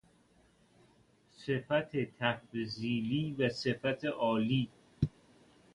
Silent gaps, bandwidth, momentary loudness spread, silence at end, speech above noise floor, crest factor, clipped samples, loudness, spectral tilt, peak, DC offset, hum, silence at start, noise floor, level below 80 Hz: none; 11 kHz; 6 LU; 0.65 s; 34 dB; 22 dB; under 0.1%; -34 LUFS; -7 dB/octave; -14 dBFS; under 0.1%; none; 1.4 s; -67 dBFS; -60 dBFS